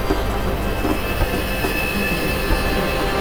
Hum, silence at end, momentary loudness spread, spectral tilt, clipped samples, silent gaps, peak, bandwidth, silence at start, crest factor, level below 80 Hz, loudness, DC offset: none; 0 s; 3 LU; -5 dB/octave; under 0.1%; none; -4 dBFS; over 20 kHz; 0 s; 14 dB; -26 dBFS; -21 LUFS; under 0.1%